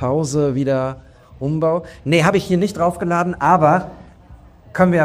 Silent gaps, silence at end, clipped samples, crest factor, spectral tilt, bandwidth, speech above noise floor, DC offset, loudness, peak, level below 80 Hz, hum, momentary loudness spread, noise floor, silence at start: none; 0 s; under 0.1%; 16 dB; -6.5 dB/octave; 14.5 kHz; 27 dB; under 0.1%; -18 LUFS; -2 dBFS; -46 dBFS; none; 12 LU; -43 dBFS; 0 s